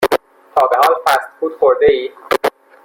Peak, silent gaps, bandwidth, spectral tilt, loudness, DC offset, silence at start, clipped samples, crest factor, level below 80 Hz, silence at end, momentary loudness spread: 0 dBFS; none; 17 kHz; -3.5 dB/octave; -15 LUFS; under 0.1%; 0 s; under 0.1%; 14 dB; -50 dBFS; 0.35 s; 8 LU